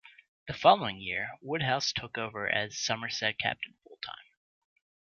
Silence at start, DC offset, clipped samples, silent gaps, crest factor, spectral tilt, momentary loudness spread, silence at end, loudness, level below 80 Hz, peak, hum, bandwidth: 0.05 s; under 0.1%; under 0.1%; 0.28-0.46 s; 24 dB; -3 dB/octave; 18 LU; 0.9 s; -30 LUFS; -64 dBFS; -8 dBFS; none; 7.2 kHz